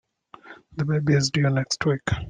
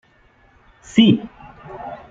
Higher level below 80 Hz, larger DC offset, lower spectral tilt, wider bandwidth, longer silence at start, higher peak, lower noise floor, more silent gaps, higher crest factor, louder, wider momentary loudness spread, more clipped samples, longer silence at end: first, -48 dBFS vs -54 dBFS; neither; about the same, -5.5 dB/octave vs -6 dB/octave; first, 9.6 kHz vs 7.8 kHz; second, 0.45 s vs 0.95 s; second, -8 dBFS vs -2 dBFS; second, -48 dBFS vs -54 dBFS; neither; about the same, 16 dB vs 18 dB; second, -23 LUFS vs -16 LUFS; second, 8 LU vs 24 LU; neither; second, 0 s vs 0.15 s